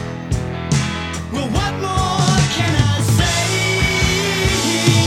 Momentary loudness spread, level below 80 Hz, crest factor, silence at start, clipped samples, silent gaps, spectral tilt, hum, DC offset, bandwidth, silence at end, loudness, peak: 8 LU; -30 dBFS; 16 dB; 0 s; under 0.1%; none; -4 dB/octave; none; under 0.1%; 16.5 kHz; 0 s; -17 LUFS; -2 dBFS